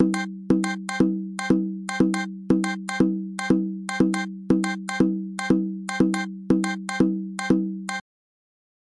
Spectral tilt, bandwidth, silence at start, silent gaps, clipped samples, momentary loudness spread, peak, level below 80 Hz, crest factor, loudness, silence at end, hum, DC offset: -6 dB/octave; 11.5 kHz; 0 s; none; under 0.1%; 6 LU; -6 dBFS; -54 dBFS; 18 dB; -24 LUFS; 1 s; none; under 0.1%